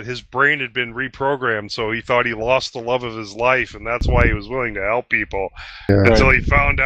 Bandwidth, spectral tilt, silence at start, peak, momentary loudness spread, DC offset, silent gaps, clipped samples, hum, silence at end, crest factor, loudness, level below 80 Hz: 8.6 kHz; -6 dB/octave; 0 s; 0 dBFS; 10 LU; under 0.1%; none; under 0.1%; none; 0 s; 18 dB; -18 LUFS; -28 dBFS